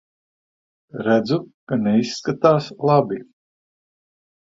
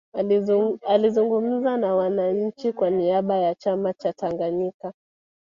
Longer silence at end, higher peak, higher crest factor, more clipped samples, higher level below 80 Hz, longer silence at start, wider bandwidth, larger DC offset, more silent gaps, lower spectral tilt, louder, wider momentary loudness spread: first, 1.2 s vs 0.5 s; first, -2 dBFS vs -6 dBFS; about the same, 20 dB vs 16 dB; neither; first, -60 dBFS vs -68 dBFS; first, 0.95 s vs 0.15 s; about the same, 7.6 kHz vs 7.2 kHz; neither; first, 1.54-1.67 s vs 4.74-4.80 s; second, -6.5 dB/octave vs -8 dB/octave; first, -20 LUFS vs -23 LUFS; first, 10 LU vs 7 LU